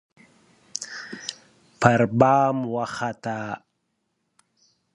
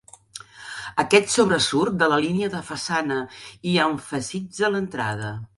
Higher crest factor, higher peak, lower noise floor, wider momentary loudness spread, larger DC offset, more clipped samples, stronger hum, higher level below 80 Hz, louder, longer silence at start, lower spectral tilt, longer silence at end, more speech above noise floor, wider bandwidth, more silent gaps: about the same, 24 dB vs 22 dB; about the same, 0 dBFS vs -2 dBFS; first, -75 dBFS vs -44 dBFS; about the same, 17 LU vs 18 LU; neither; neither; neither; about the same, -62 dBFS vs -58 dBFS; about the same, -23 LUFS vs -22 LUFS; first, 0.8 s vs 0.35 s; first, -5.5 dB/octave vs -4 dB/octave; first, 1.35 s vs 0.1 s; first, 54 dB vs 21 dB; about the same, 11 kHz vs 11.5 kHz; neither